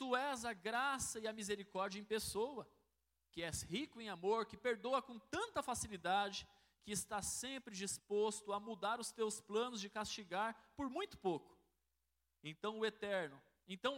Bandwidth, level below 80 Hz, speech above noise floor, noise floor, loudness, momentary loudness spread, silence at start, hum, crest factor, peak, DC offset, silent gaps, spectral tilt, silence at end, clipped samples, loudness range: 16 kHz; -70 dBFS; 44 dB; -87 dBFS; -43 LUFS; 8 LU; 0 s; none; 20 dB; -24 dBFS; under 0.1%; none; -3 dB/octave; 0 s; under 0.1%; 3 LU